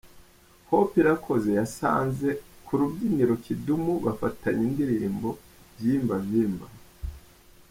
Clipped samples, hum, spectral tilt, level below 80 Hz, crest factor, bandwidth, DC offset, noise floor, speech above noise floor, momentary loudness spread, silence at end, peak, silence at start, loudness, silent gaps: under 0.1%; none; -7.5 dB/octave; -50 dBFS; 18 dB; 16.5 kHz; under 0.1%; -55 dBFS; 30 dB; 12 LU; 0.5 s; -10 dBFS; 0.05 s; -26 LUFS; none